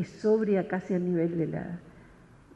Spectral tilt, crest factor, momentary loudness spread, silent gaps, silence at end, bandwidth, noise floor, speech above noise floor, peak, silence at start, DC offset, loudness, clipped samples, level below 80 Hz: -9 dB/octave; 16 dB; 12 LU; none; 0.5 s; 8.4 kHz; -54 dBFS; 26 dB; -14 dBFS; 0 s; under 0.1%; -28 LUFS; under 0.1%; -62 dBFS